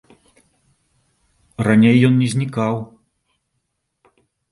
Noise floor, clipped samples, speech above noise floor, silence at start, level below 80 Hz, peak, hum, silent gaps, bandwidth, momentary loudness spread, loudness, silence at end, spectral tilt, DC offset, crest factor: -73 dBFS; under 0.1%; 58 dB; 1.6 s; -54 dBFS; 0 dBFS; none; none; 11.5 kHz; 19 LU; -16 LUFS; 1.65 s; -7 dB/octave; under 0.1%; 20 dB